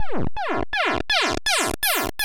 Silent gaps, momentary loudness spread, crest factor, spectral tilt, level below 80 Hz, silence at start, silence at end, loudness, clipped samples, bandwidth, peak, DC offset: none; 7 LU; 18 dB; -2 dB/octave; -40 dBFS; 0 s; 0 s; -22 LUFS; under 0.1%; 17 kHz; -4 dBFS; under 0.1%